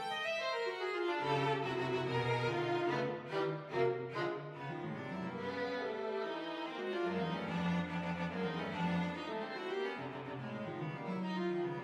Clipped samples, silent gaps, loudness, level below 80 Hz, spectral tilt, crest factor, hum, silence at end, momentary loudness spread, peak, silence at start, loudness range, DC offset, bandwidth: under 0.1%; none; -38 LUFS; -72 dBFS; -6.5 dB/octave; 16 dB; none; 0 s; 7 LU; -20 dBFS; 0 s; 4 LU; under 0.1%; 11 kHz